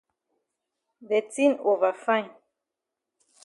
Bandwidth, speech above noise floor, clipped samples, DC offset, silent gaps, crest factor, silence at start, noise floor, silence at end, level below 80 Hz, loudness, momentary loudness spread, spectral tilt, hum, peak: 11.5 kHz; 62 dB; under 0.1%; under 0.1%; none; 18 dB; 1 s; -86 dBFS; 1.15 s; -86 dBFS; -25 LUFS; 5 LU; -4 dB/octave; none; -10 dBFS